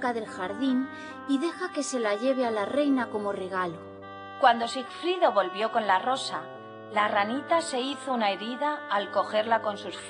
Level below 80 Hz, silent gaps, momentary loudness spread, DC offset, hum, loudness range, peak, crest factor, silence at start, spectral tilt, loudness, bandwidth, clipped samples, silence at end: -74 dBFS; none; 10 LU; under 0.1%; none; 2 LU; -8 dBFS; 20 dB; 0 s; -3.5 dB/octave; -28 LUFS; 10 kHz; under 0.1%; 0 s